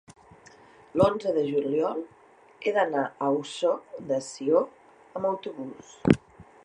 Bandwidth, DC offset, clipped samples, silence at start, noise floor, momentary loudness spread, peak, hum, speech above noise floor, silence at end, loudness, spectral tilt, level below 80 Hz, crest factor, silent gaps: 11 kHz; under 0.1%; under 0.1%; 0.1 s; -53 dBFS; 13 LU; -4 dBFS; none; 27 dB; 0.25 s; -27 LUFS; -6.5 dB/octave; -58 dBFS; 24 dB; none